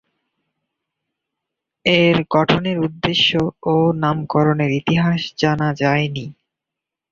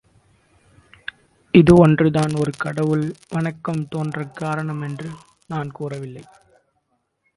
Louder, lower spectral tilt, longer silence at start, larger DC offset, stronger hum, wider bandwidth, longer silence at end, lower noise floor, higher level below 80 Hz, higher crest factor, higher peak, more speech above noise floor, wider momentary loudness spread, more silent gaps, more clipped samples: about the same, -17 LUFS vs -19 LUFS; about the same, -6.5 dB/octave vs -7.5 dB/octave; first, 1.85 s vs 1.55 s; neither; neither; second, 7.2 kHz vs 11.5 kHz; second, 0.8 s vs 1.15 s; first, -84 dBFS vs -70 dBFS; about the same, -50 dBFS vs -46 dBFS; about the same, 18 dB vs 20 dB; about the same, -2 dBFS vs 0 dBFS; first, 67 dB vs 51 dB; second, 6 LU vs 23 LU; neither; neither